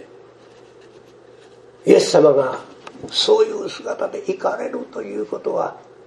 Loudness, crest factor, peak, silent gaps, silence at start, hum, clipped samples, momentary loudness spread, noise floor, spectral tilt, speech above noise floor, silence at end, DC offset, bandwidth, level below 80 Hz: -19 LUFS; 20 dB; 0 dBFS; none; 0 s; none; under 0.1%; 15 LU; -46 dBFS; -4 dB/octave; 28 dB; 0.25 s; under 0.1%; 12 kHz; -68 dBFS